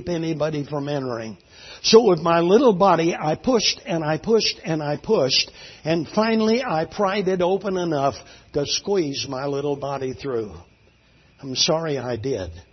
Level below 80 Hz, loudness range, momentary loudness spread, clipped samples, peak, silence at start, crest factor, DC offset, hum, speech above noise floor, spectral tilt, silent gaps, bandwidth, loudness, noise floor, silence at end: -54 dBFS; 7 LU; 13 LU; under 0.1%; -2 dBFS; 0 s; 20 dB; under 0.1%; none; 35 dB; -4.5 dB/octave; none; 6.4 kHz; -21 LUFS; -56 dBFS; 0.1 s